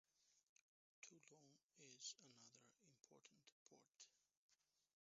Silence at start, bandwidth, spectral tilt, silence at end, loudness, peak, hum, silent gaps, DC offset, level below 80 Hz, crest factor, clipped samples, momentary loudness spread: 0.1 s; 7.6 kHz; -1.5 dB/octave; 0.15 s; -62 LUFS; -42 dBFS; none; 0.43-0.56 s, 0.63-1.02 s, 1.64-1.69 s, 3.52-3.66 s, 4.37-4.49 s; under 0.1%; under -90 dBFS; 28 dB; under 0.1%; 12 LU